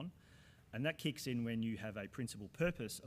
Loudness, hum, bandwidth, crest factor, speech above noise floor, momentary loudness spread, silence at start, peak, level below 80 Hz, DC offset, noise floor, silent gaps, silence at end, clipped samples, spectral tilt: -42 LUFS; none; 15.5 kHz; 18 dB; 23 dB; 7 LU; 0 s; -24 dBFS; -64 dBFS; under 0.1%; -64 dBFS; none; 0 s; under 0.1%; -5.5 dB/octave